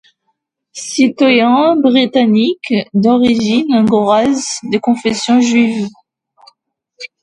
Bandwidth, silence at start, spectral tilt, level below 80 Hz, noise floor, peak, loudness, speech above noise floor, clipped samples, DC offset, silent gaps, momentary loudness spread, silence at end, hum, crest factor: 11 kHz; 0.75 s; -4.5 dB/octave; -54 dBFS; -68 dBFS; 0 dBFS; -12 LUFS; 56 dB; under 0.1%; under 0.1%; none; 11 LU; 0.15 s; none; 12 dB